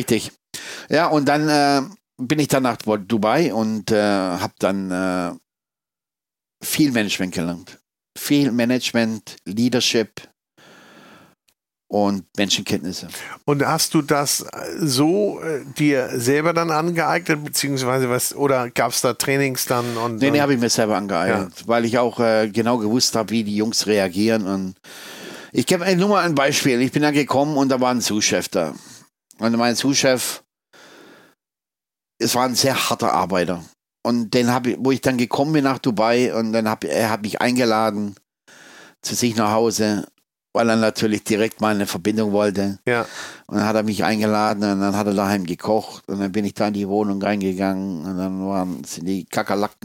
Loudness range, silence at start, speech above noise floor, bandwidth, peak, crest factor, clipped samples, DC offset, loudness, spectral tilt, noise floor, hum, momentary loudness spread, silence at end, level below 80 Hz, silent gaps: 4 LU; 0 s; over 70 dB; 17 kHz; -2 dBFS; 18 dB; under 0.1%; under 0.1%; -20 LUFS; -4.5 dB/octave; under -90 dBFS; none; 9 LU; 0.15 s; -62 dBFS; none